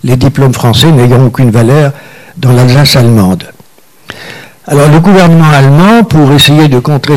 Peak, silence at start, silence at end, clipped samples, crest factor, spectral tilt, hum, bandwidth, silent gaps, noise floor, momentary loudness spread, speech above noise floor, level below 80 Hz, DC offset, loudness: 0 dBFS; 0.05 s; 0 s; 0.8%; 4 dB; -6 dB/octave; none; 16.5 kHz; none; -40 dBFS; 10 LU; 36 dB; -32 dBFS; under 0.1%; -5 LUFS